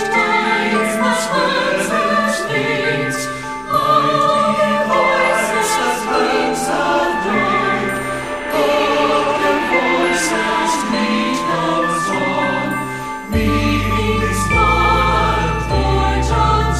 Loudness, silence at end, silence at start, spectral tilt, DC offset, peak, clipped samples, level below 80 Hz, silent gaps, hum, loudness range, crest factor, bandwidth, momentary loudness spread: -16 LUFS; 0 s; 0 s; -4.5 dB/octave; under 0.1%; -2 dBFS; under 0.1%; -28 dBFS; none; none; 2 LU; 14 dB; 15.5 kHz; 5 LU